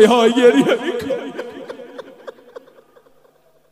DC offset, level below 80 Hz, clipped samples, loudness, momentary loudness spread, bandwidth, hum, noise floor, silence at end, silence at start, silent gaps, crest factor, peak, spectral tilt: under 0.1%; -62 dBFS; under 0.1%; -15 LUFS; 25 LU; 15 kHz; none; -55 dBFS; 1.4 s; 0 s; none; 18 dB; 0 dBFS; -4.5 dB/octave